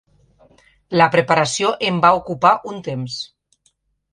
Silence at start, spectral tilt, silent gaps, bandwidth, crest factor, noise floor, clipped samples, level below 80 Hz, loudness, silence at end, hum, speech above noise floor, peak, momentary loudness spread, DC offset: 0.9 s; -4.5 dB/octave; none; 11.5 kHz; 18 dB; -64 dBFS; under 0.1%; -56 dBFS; -17 LUFS; 0.85 s; none; 47 dB; 0 dBFS; 13 LU; under 0.1%